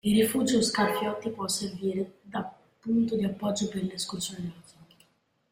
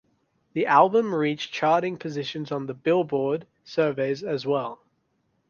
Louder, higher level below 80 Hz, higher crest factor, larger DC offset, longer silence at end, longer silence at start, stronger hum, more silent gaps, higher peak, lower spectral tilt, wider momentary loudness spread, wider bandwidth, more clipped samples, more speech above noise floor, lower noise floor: second, -29 LUFS vs -25 LUFS; first, -62 dBFS vs -70 dBFS; second, 16 dB vs 22 dB; neither; first, 0.9 s vs 0.75 s; second, 0.05 s vs 0.55 s; neither; neither; second, -12 dBFS vs -4 dBFS; second, -4.5 dB/octave vs -6.5 dB/octave; about the same, 12 LU vs 12 LU; first, 16 kHz vs 7 kHz; neither; second, 40 dB vs 47 dB; about the same, -68 dBFS vs -71 dBFS